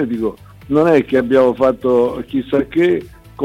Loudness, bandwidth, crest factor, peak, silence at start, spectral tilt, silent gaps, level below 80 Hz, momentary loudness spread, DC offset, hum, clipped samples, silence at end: -15 LUFS; 13.5 kHz; 12 dB; -4 dBFS; 0 s; -7.5 dB/octave; none; -44 dBFS; 9 LU; under 0.1%; none; under 0.1%; 0 s